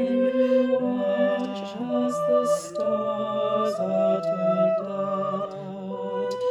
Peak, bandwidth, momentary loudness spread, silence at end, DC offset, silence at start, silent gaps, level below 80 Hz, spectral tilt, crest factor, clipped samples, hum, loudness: -12 dBFS; 13.5 kHz; 9 LU; 0 s; under 0.1%; 0 s; none; -70 dBFS; -6.5 dB/octave; 12 dB; under 0.1%; none; -25 LUFS